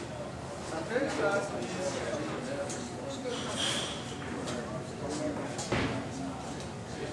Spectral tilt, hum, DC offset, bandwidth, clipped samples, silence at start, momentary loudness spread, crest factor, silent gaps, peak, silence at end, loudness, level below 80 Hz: -4 dB/octave; none; under 0.1%; 13 kHz; under 0.1%; 0 s; 9 LU; 18 dB; none; -18 dBFS; 0 s; -35 LUFS; -54 dBFS